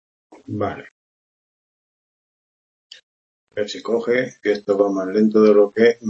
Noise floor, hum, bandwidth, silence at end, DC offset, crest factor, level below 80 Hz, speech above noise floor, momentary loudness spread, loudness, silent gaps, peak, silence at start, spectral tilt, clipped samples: under -90 dBFS; none; 7.6 kHz; 0 s; under 0.1%; 18 dB; -66 dBFS; over 72 dB; 14 LU; -19 LUFS; 0.91-2.90 s, 3.03-3.47 s; -2 dBFS; 0.5 s; -6.5 dB/octave; under 0.1%